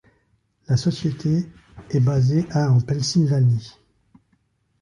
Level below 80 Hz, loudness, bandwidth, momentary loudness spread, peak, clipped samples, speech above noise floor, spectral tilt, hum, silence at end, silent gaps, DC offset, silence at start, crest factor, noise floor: -50 dBFS; -21 LUFS; 10.5 kHz; 6 LU; -8 dBFS; under 0.1%; 47 dB; -7 dB/octave; none; 1.1 s; none; under 0.1%; 0.7 s; 14 dB; -66 dBFS